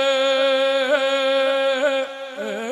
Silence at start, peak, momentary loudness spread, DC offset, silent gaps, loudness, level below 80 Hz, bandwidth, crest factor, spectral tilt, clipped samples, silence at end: 0 s; -4 dBFS; 10 LU; under 0.1%; none; -19 LUFS; -84 dBFS; 11.5 kHz; 16 dB; -1.5 dB/octave; under 0.1%; 0 s